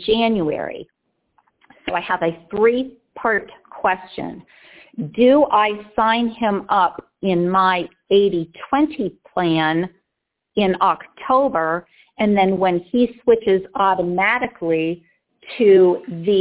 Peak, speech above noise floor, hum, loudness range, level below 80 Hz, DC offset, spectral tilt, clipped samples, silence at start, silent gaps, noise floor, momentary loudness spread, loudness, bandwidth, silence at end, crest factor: -4 dBFS; 61 dB; none; 5 LU; -54 dBFS; under 0.1%; -10 dB/octave; under 0.1%; 0 s; none; -79 dBFS; 12 LU; -19 LUFS; 4 kHz; 0 s; 16 dB